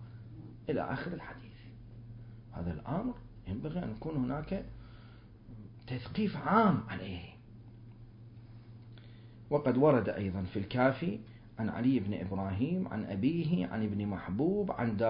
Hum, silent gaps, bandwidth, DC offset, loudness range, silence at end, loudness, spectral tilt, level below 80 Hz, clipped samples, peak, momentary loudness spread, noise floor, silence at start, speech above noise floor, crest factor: none; none; 5.2 kHz; under 0.1%; 8 LU; 0 s; -34 LUFS; -7 dB/octave; -54 dBFS; under 0.1%; -12 dBFS; 24 LU; -53 dBFS; 0 s; 21 dB; 22 dB